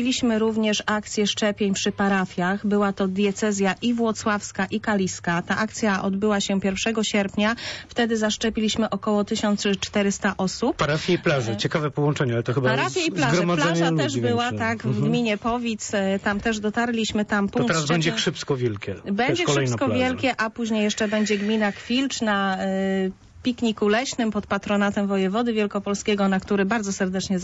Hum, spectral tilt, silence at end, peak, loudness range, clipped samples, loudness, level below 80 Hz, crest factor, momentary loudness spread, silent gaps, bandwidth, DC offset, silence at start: none; -4.5 dB/octave; 0 s; -10 dBFS; 2 LU; under 0.1%; -23 LUFS; -52 dBFS; 14 dB; 4 LU; none; 8 kHz; under 0.1%; 0 s